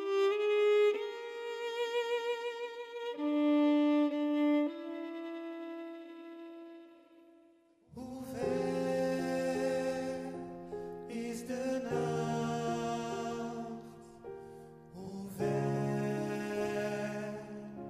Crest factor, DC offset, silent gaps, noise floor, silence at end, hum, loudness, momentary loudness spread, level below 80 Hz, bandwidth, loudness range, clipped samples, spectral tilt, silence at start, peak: 14 dB; under 0.1%; none; -65 dBFS; 0 s; none; -35 LUFS; 19 LU; -70 dBFS; 15 kHz; 8 LU; under 0.1%; -6 dB/octave; 0 s; -20 dBFS